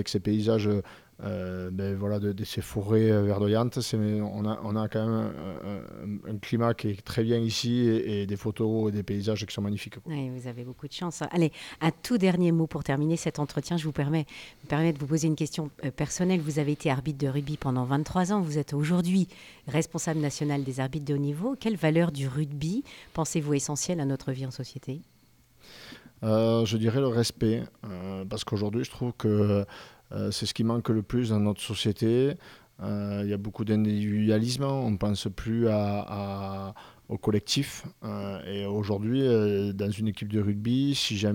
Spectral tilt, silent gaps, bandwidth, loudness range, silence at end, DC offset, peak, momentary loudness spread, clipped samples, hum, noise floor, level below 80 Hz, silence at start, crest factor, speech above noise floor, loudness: -6 dB/octave; none; 17 kHz; 3 LU; 0 s; under 0.1%; -12 dBFS; 12 LU; under 0.1%; none; -60 dBFS; -56 dBFS; 0 s; 16 dB; 33 dB; -28 LUFS